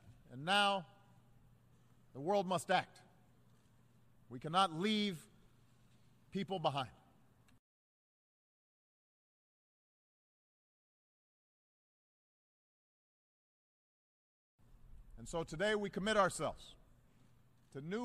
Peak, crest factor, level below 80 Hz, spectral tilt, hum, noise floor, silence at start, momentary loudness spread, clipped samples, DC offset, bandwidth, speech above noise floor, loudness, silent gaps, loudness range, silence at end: -18 dBFS; 24 dB; -68 dBFS; -4 dB/octave; none; -69 dBFS; 0.05 s; 21 LU; under 0.1%; under 0.1%; 15 kHz; 32 dB; -37 LUFS; 7.59-14.58 s; 8 LU; 0 s